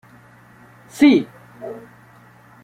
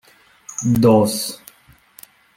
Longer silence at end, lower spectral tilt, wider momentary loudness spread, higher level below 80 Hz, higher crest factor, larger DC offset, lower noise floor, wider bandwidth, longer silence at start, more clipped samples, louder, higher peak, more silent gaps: second, 0.85 s vs 1 s; about the same, -5.5 dB/octave vs -6 dB/octave; first, 24 LU vs 18 LU; second, -62 dBFS vs -52 dBFS; about the same, 20 dB vs 18 dB; neither; second, -48 dBFS vs -52 dBFS; second, 14 kHz vs 16.5 kHz; first, 0.95 s vs 0.5 s; neither; about the same, -15 LUFS vs -17 LUFS; about the same, -2 dBFS vs -2 dBFS; neither